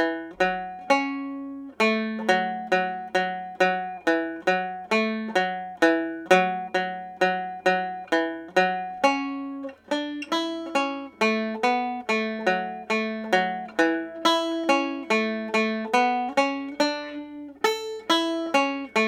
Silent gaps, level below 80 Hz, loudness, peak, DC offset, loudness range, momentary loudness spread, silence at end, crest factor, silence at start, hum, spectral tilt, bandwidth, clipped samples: none; -70 dBFS; -25 LUFS; -4 dBFS; under 0.1%; 2 LU; 7 LU; 0 s; 22 dB; 0 s; none; -4 dB/octave; 16.5 kHz; under 0.1%